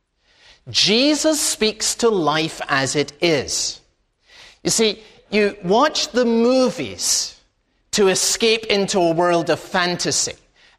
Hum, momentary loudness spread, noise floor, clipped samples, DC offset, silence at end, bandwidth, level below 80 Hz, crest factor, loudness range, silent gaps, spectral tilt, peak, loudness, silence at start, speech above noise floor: none; 6 LU; -64 dBFS; under 0.1%; under 0.1%; 0.45 s; 15.5 kHz; -54 dBFS; 18 dB; 3 LU; none; -2.5 dB/octave; -2 dBFS; -18 LUFS; 0.65 s; 45 dB